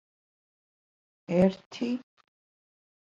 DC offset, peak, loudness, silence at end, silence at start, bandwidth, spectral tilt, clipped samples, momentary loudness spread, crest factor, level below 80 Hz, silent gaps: under 0.1%; -10 dBFS; -29 LUFS; 1.15 s; 1.3 s; 7.4 kHz; -8 dB/octave; under 0.1%; 10 LU; 22 dB; -66 dBFS; 1.66-1.71 s